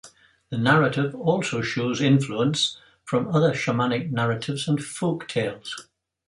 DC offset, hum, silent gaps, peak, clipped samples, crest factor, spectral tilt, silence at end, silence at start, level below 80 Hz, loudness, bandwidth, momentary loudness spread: under 0.1%; none; none; -4 dBFS; under 0.1%; 20 dB; -5.5 dB/octave; 0.5 s; 0.05 s; -62 dBFS; -24 LUFS; 11.5 kHz; 8 LU